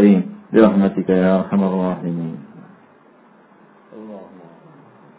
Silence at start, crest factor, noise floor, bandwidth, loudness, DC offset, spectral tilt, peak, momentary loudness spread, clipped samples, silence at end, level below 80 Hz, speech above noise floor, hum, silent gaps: 0 s; 18 dB; -50 dBFS; 4 kHz; -17 LUFS; under 0.1%; -12.5 dB/octave; 0 dBFS; 23 LU; under 0.1%; 0.95 s; -58 dBFS; 34 dB; none; none